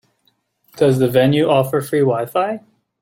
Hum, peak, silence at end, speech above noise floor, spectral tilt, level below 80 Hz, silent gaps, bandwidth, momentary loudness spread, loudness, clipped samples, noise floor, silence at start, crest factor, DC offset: none; -2 dBFS; 0.45 s; 49 dB; -6.5 dB/octave; -56 dBFS; none; 17 kHz; 7 LU; -16 LUFS; under 0.1%; -64 dBFS; 0.75 s; 14 dB; under 0.1%